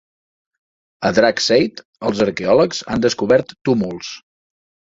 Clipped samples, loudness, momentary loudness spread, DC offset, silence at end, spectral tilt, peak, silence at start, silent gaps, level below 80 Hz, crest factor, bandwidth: under 0.1%; -17 LUFS; 10 LU; under 0.1%; 0.75 s; -4.5 dB/octave; -2 dBFS; 1 s; 1.85-1.93 s, 3.61-3.65 s; -50 dBFS; 18 dB; 7.8 kHz